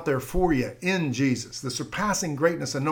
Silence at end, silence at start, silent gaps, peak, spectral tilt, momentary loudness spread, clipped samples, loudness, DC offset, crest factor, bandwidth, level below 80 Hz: 0 s; 0 s; none; -10 dBFS; -5 dB/octave; 6 LU; under 0.1%; -26 LUFS; under 0.1%; 16 dB; 18.5 kHz; -40 dBFS